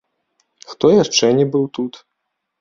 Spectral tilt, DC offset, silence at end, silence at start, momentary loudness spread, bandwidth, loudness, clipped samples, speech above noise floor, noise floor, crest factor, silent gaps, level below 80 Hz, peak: -4.5 dB/octave; under 0.1%; 0.7 s; 0.7 s; 14 LU; 7.6 kHz; -16 LUFS; under 0.1%; 61 dB; -75 dBFS; 18 dB; none; -58 dBFS; 0 dBFS